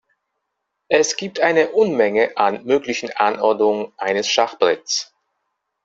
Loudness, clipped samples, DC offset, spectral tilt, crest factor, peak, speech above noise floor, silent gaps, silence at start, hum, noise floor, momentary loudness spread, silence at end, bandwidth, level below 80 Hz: -18 LUFS; under 0.1%; under 0.1%; -2.5 dB/octave; 18 dB; 0 dBFS; 59 dB; none; 0.9 s; none; -77 dBFS; 6 LU; 0.8 s; 7.8 kHz; -64 dBFS